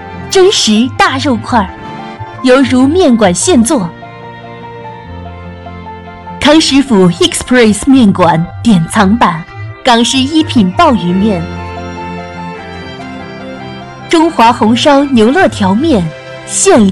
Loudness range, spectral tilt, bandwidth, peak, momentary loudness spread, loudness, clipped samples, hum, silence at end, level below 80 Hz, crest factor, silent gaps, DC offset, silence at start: 6 LU; -4.5 dB/octave; 12.5 kHz; 0 dBFS; 20 LU; -8 LUFS; under 0.1%; none; 0 s; -36 dBFS; 10 dB; none; under 0.1%; 0 s